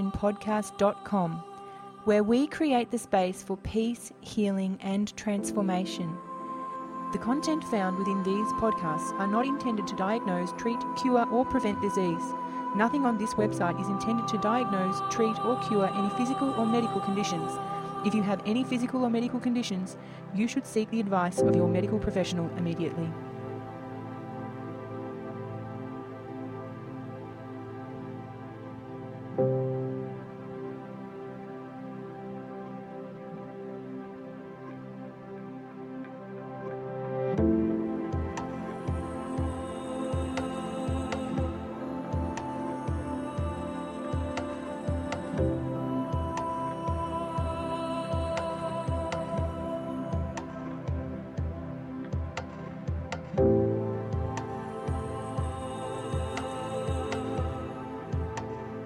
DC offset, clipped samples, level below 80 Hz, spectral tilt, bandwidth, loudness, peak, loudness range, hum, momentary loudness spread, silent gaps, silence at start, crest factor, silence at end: under 0.1%; under 0.1%; -46 dBFS; -6.5 dB/octave; 14 kHz; -31 LUFS; -12 dBFS; 12 LU; none; 14 LU; none; 0 s; 18 dB; 0 s